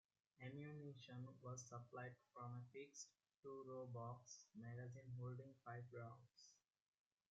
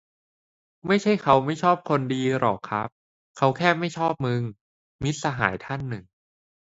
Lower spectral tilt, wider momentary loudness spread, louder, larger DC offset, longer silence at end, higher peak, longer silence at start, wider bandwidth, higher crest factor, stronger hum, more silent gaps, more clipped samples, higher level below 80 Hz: about the same, -6.5 dB/octave vs -6 dB/octave; second, 7 LU vs 11 LU; second, -57 LUFS vs -24 LUFS; neither; about the same, 0.75 s vs 0.65 s; second, -42 dBFS vs -2 dBFS; second, 0.4 s vs 0.85 s; about the same, 7.6 kHz vs 8 kHz; second, 16 dB vs 22 dB; neither; second, 3.39-3.43 s vs 2.92-3.35 s, 4.61-4.99 s; neither; second, -90 dBFS vs -56 dBFS